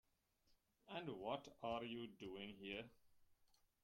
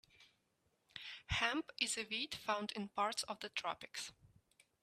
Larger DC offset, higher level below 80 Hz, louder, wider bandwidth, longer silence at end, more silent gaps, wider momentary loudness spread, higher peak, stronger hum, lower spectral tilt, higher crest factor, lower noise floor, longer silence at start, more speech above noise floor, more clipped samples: neither; second, -80 dBFS vs -64 dBFS; second, -51 LUFS vs -41 LUFS; about the same, 16.5 kHz vs 15 kHz; second, 0.3 s vs 0.55 s; neither; second, 6 LU vs 13 LU; second, -32 dBFS vs -20 dBFS; neither; first, -5.5 dB/octave vs -2 dB/octave; about the same, 20 dB vs 24 dB; about the same, -81 dBFS vs -81 dBFS; first, 0.5 s vs 0.2 s; second, 31 dB vs 39 dB; neither